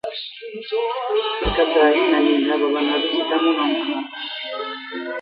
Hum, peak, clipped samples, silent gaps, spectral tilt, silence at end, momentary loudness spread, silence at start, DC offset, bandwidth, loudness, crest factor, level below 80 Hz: none; -4 dBFS; under 0.1%; none; -7 dB/octave; 0 s; 13 LU; 0.05 s; under 0.1%; 5.4 kHz; -20 LUFS; 18 dB; -42 dBFS